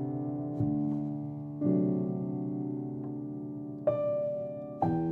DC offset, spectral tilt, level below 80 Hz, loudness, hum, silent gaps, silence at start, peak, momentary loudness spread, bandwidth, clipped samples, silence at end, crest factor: under 0.1%; -12.5 dB/octave; -64 dBFS; -33 LUFS; none; none; 0 s; -16 dBFS; 10 LU; 3.8 kHz; under 0.1%; 0 s; 16 dB